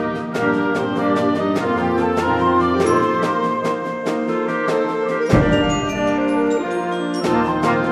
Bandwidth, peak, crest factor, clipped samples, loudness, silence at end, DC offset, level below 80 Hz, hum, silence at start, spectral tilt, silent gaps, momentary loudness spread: 13 kHz; -2 dBFS; 18 dB; under 0.1%; -19 LUFS; 0 s; under 0.1%; -40 dBFS; none; 0 s; -6.5 dB/octave; none; 5 LU